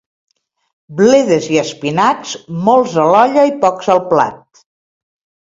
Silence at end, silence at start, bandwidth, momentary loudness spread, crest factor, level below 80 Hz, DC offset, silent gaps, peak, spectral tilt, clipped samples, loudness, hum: 1.2 s; 0.9 s; 7.8 kHz; 9 LU; 14 dB; -58 dBFS; under 0.1%; none; 0 dBFS; -5 dB/octave; under 0.1%; -13 LUFS; none